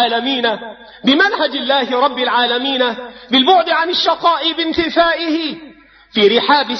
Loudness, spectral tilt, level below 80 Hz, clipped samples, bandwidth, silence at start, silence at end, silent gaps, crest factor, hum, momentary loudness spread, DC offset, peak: -14 LUFS; -4 dB/octave; -52 dBFS; under 0.1%; 6.4 kHz; 0 s; 0 s; none; 14 dB; none; 8 LU; under 0.1%; 0 dBFS